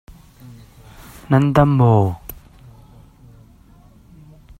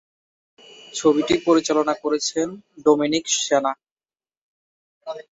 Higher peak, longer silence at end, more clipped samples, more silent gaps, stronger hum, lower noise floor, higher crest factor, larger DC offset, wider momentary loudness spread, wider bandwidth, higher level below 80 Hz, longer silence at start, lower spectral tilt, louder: first, 0 dBFS vs -4 dBFS; first, 2.25 s vs 0.1 s; neither; second, none vs 3.91-3.96 s, 4.37-5.01 s; neither; second, -47 dBFS vs under -90 dBFS; about the same, 20 dB vs 20 dB; neither; first, 23 LU vs 16 LU; first, 15.5 kHz vs 8 kHz; first, -44 dBFS vs -62 dBFS; first, 1.3 s vs 0.95 s; first, -9 dB/octave vs -3 dB/octave; first, -16 LUFS vs -20 LUFS